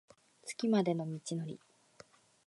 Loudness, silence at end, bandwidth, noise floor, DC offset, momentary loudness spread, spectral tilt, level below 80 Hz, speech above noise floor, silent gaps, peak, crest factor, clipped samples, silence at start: -36 LUFS; 0.9 s; 11.5 kHz; -62 dBFS; under 0.1%; 17 LU; -6 dB/octave; -84 dBFS; 27 dB; none; -18 dBFS; 20 dB; under 0.1%; 0.45 s